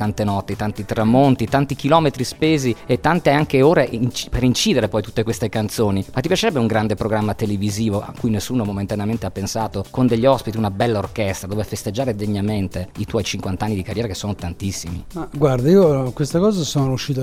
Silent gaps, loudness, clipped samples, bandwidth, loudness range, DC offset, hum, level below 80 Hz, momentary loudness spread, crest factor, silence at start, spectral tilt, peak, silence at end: none; -19 LUFS; under 0.1%; 16 kHz; 6 LU; under 0.1%; none; -40 dBFS; 10 LU; 18 dB; 0 s; -6 dB/octave; 0 dBFS; 0 s